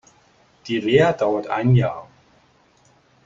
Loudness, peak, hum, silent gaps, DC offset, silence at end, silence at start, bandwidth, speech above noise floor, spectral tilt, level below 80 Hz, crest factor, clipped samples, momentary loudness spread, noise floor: -19 LUFS; -2 dBFS; none; none; under 0.1%; 1.2 s; 0.65 s; 7.6 kHz; 39 dB; -7.5 dB/octave; -50 dBFS; 20 dB; under 0.1%; 14 LU; -57 dBFS